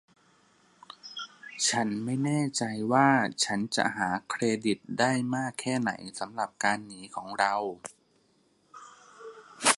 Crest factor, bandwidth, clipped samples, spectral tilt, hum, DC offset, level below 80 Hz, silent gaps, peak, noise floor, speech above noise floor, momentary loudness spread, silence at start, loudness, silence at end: 22 dB; 11.5 kHz; under 0.1%; -3.5 dB/octave; none; under 0.1%; -72 dBFS; none; -8 dBFS; -68 dBFS; 39 dB; 19 LU; 1.05 s; -28 LUFS; 0 s